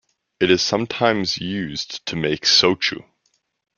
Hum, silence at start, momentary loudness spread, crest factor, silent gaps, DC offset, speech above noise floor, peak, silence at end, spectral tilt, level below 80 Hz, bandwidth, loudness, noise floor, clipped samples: none; 0.4 s; 13 LU; 20 dB; none; under 0.1%; 48 dB; -2 dBFS; 0.75 s; -3.5 dB/octave; -56 dBFS; 7.2 kHz; -19 LUFS; -68 dBFS; under 0.1%